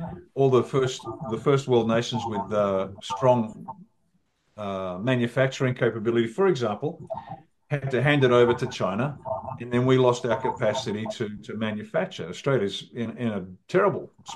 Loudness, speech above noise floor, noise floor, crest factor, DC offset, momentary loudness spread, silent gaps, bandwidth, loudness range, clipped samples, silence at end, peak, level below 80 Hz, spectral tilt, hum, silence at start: -25 LUFS; 46 dB; -70 dBFS; 20 dB; under 0.1%; 13 LU; none; 11.5 kHz; 4 LU; under 0.1%; 0 s; -6 dBFS; -62 dBFS; -6.5 dB/octave; none; 0 s